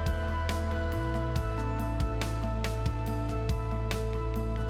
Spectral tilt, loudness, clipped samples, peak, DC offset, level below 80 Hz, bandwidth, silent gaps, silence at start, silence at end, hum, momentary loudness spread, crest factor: -6.5 dB/octave; -32 LUFS; under 0.1%; -14 dBFS; under 0.1%; -34 dBFS; 16 kHz; none; 0 s; 0 s; none; 1 LU; 16 dB